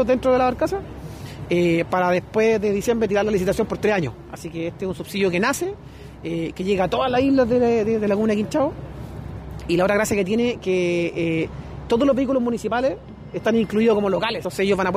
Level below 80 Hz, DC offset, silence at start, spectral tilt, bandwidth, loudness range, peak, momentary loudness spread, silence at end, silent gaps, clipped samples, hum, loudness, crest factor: -44 dBFS; under 0.1%; 0 s; -6 dB/octave; 15.5 kHz; 2 LU; -8 dBFS; 16 LU; 0 s; none; under 0.1%; none; -21 LUFS; 12 dB